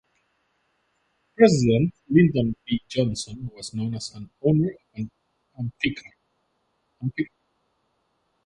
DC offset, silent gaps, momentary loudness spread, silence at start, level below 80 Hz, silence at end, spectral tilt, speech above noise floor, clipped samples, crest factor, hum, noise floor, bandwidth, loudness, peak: under 0.1%; none; 17 LU; 1.4 s; -54 dBFS; 1.2 s; -6.5 dB/octave; 49 dB; under 0.1%; 22 dB; none; -72 dBFS; 11 kHz; -24 LUFS; -4 dBFS